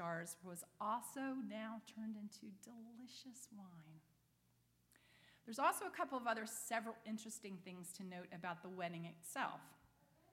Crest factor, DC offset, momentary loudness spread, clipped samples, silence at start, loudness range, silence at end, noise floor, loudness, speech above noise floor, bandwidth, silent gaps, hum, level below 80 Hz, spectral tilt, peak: 24 dB; under 0.1%; 16 LU; under 0.1%; 0 s; 12 LU; 0.55 s; -78 dBFS; -47 LUFS; 31 dB; 16.5 kHz; none; none; -88 dBFS; -4 dB/octave; -24 dBFS